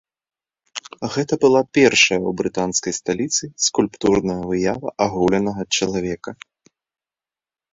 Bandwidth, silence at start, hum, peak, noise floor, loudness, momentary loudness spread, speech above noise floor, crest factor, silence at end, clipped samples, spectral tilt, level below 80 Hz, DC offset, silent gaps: 8 kHz; 0.75 s; none; -2 dBFS; under -90 dBFS; -19 LUFS; 13 LU; over 71 dB; 20 dB; 1.4 s; under 0.1%; -3.5 dB/octave; -50 dBFS; under 0.1%; none